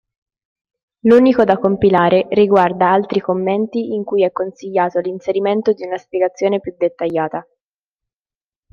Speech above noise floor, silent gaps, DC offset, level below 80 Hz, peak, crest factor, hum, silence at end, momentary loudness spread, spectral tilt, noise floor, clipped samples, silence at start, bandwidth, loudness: over 75 dB; none; under 0.1%; -54 dBFS; -2 dBFS; 16 dB; none; 1.3 s; 9 LU; -7.5 dB/octave; under -90 dBFS; under 0.1%; 1.05 s; 7 kHz; -16 LUFS